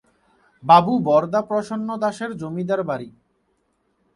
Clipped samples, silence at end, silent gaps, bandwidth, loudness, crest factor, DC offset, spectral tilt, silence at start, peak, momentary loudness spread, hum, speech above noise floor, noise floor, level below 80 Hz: under 0.1%; 1.05 s; none; 11.5 kHz; -20 LUFS; 22 dB; under 0.1%; -7 dB/octave; 0.65 s; 0 dBFS; 15 LU; none; 48 dB; -68 dBFS; -64 dBFS